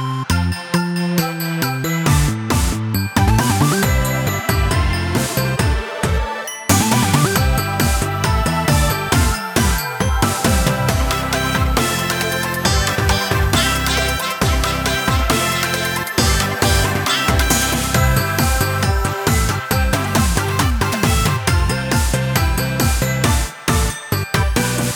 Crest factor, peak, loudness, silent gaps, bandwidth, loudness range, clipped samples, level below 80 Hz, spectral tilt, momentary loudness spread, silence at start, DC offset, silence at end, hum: 16 dB; 0 dBFS; -17 LUFS; none; over 20 kHz; 2 LU; under 0.1%; -24 dBFS; -4 dB/octave; 4 LU; 0 s; under 0.1%; 0 s; none